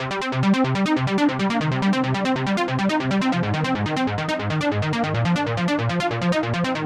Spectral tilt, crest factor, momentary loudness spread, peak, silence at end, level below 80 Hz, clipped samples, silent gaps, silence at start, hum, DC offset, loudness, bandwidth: -6.5 dB/octave; 12 dB; 3 LU; -8 dBFS; 0 s; -52 dBFS; under 0.1%; none; 0 s; none; under 0.1%; -22 LUFS; 11.5 kHz